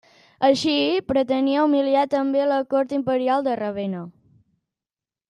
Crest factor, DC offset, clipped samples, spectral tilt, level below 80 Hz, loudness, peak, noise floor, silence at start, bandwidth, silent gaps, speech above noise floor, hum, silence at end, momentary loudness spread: 18 dB; under 0.1%; under 0.1%; -5.5 dB/octave; -60 dBFS; -21 LUFS; -4 dBFS; under -90 dBFS; 0.4 s; 10 kHz; none; over 69 dB; none; 1.2 s; 8 LU